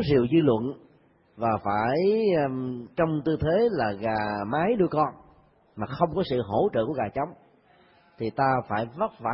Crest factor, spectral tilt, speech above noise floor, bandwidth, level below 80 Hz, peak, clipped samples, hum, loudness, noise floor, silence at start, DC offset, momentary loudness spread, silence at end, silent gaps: 18 dB; -11.5 dB/octave; 35 dB; 5.8 kHz; -54 dBFS; -8 dBFS; under 0.1%; none; -26 LUFS; -60 dBFS; 0 s; under 0.1%; 10 LU; 0 s; none